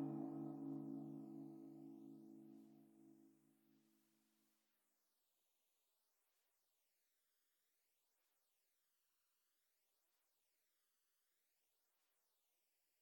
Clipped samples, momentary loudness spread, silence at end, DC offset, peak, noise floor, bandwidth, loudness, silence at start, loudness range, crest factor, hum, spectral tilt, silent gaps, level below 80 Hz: under 0.1%; 18 LU; 9.25 s; under 0.1%; -38 dBFS; -87 dBFS; 18 kHz; -54 LUFS; 0 s; 13 LU; 22 dB; none; -9 dB/octave; none; under -90 dBFS